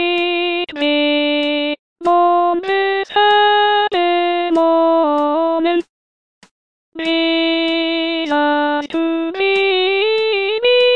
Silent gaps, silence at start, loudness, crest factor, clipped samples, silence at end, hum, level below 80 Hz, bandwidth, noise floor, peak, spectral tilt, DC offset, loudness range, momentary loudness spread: 1.79-1.96 s, 5.89-6.41 s, 6.51-6.92 s; 0 s; -15 LUFS; 12 dB; under 0.1%; 0 s; none; -64 dBFS; 8.6 kHz; under -90 dBFS; -4 dBFS; -3.5 dB/octave; 0.4%; 4 LU; 6 LU